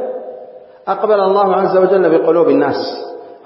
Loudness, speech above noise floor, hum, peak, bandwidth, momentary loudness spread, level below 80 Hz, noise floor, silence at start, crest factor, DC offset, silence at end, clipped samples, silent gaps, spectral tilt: -13 LUFS; 23 dB; none; 0 dBFS; 5.8 kHz; 17 LU; -70 dBFS; -36 dBFS; 0 s; 14 dB; under 0.1%; 0.1 s; under 0.1%; none; -10.5 dB/octave